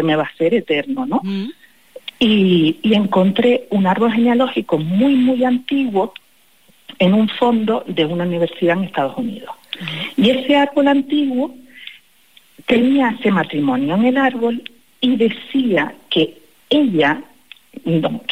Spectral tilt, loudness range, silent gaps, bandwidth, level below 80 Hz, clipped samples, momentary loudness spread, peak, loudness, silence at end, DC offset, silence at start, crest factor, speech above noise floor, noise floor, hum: -7 dB/octave; 3 LU; none; 15 kHz; -60 dBFS; under 0.1%; 12 LU; -4 dBFS; -17 LUFS; 0 s; 0.4%; 0 s; 14 dB; 38 dB; -54 dBFS; none